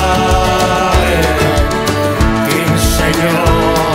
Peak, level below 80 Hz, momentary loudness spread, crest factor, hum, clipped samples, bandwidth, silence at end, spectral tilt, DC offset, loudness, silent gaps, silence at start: -2 dBFS; -20 dBFS; 2 LU; 10 dB; none; under 0.1%; 16.5 kHz; 0 s; -5 dB/octave; under 0.1%; -12 LUFS; none; 0 s